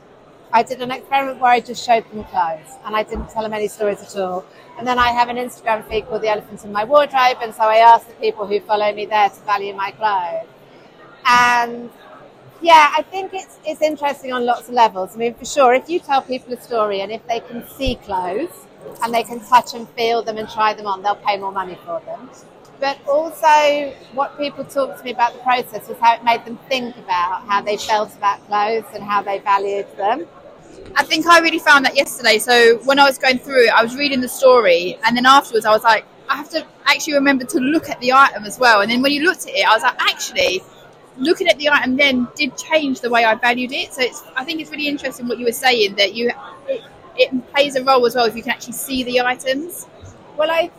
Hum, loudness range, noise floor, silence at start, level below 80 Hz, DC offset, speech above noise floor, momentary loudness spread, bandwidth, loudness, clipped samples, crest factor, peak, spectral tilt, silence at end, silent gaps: none; 7 LU; -45 dBFS; 0.5 s; -48 dBFS; under 0.1%; 28 dB; 13 LU; 16 kHz; -17 LUFS; under 0.1%; 16 dB; 0 dBFS; -2.5 dB/octave; 0.1 s; none